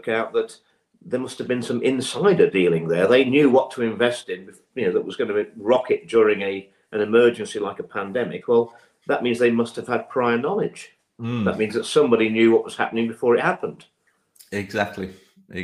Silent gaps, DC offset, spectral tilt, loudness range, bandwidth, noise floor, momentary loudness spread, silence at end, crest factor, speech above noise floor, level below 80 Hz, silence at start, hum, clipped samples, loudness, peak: none; under 0.1%; -5.5 dB/octave; 4 LU; 12 kHz; -56 dBFS; 14 LU; 0 s; 18 dB; 35 dB; -66 dBFS; 0.05 s; none; under 0.1%; -21 LUFS; -4 dBFS